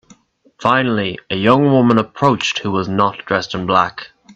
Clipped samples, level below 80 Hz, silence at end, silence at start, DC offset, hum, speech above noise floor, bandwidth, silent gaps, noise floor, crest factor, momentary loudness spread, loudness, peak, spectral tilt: under 0.1%; -52 dBFS; 0.05 s; 0.6 s; under 0.1%; none; 34 dB; 8.2 kHz; none; -50 dBFS; 16 dB; 8 LU; -16 LUFS; 0 dBFS; -6 dB/octave